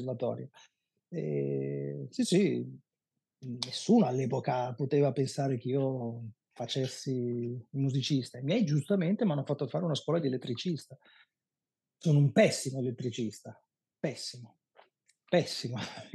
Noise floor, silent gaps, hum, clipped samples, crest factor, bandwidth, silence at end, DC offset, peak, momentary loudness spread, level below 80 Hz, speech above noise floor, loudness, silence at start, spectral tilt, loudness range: under -90 dBFS; none; none; under 0.1%; 22 dB; 12.5 kHz; 0.05 s; under 0.1%; -10 dBFS; 14 LU; -88 dBFS; over 59 dB; -31 LUFS; 0 s; -6 dB/octave; 3 LU